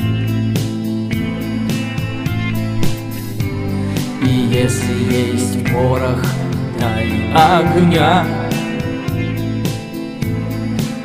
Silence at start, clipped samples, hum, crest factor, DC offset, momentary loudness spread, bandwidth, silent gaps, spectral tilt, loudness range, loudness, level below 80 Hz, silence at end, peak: 0 s; under 0.1%; none; 16 dB; under 0.1%; 9 LU; 16 kHz; none; -6 dB/octave; 5 LU; -17 LUFS; -34 dBFS; 0 s; 0 dBFS